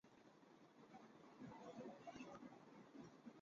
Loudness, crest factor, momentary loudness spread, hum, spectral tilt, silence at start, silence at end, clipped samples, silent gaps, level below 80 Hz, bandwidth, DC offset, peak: -61 LUFS; 16 dB; 11 LU; none; -5 dB/octave; 0.05 s; 0 s; under 0.1%; none; under -90 dBFS; 7.4 kHz; under 0.1%; -44 dBFS